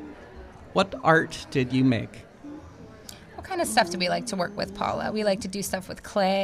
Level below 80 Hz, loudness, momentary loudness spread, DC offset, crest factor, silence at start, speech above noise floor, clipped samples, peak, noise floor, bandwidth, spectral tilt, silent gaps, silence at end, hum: -52 dBFS; -26 LUFS; 21 LU; under 0.1%; 20 dB; 0 s; 20 dB; under 0.1%; -6 dBFS; -46 dBFS; 15.5 kHz; -4.5 dB/octave; none; 0 s; none